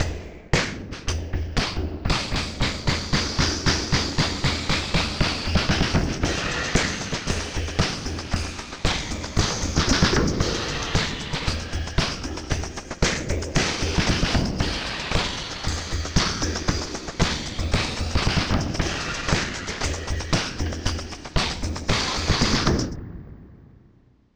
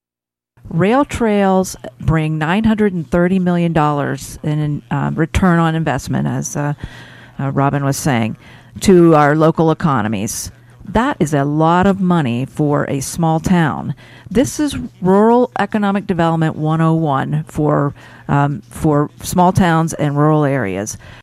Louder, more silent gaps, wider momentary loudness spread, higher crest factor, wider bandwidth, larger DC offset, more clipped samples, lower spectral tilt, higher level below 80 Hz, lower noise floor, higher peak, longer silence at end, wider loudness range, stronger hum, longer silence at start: second, -24 LUFS vs -15 LUFS; neither; second, 7 LU vs 10 LU; first, 20 dB vs 14 dB; first, over 20 kHz vs 15.5 kHz; neither; neither; second, -4 dB/octave vs -6.5 dB/octave; first, -32 dBFS vs -38 dBFS; second, -56 dBFS vs -88 dBFS; about the same, -4 dBFS vs -2 dBFS; first, 0.7 s vs 0 s; about the same, 3 LU vs 3 LU; neither; second, 0 s vs 0.65 s